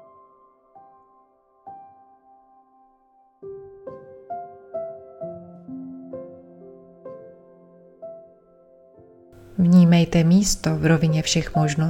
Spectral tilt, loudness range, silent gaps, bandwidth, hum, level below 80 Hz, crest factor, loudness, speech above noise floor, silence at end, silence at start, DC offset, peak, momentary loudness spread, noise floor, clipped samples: -6 dB/octave; 25 LU; none; 13.5 kHz; none; -46 dBFS; 20 dB; -19 LUFS; 42 dB; 0 s; 1.65 s; under 0.1%; -6 dBFS; 27 LU; -59 dBFS; under 0.1%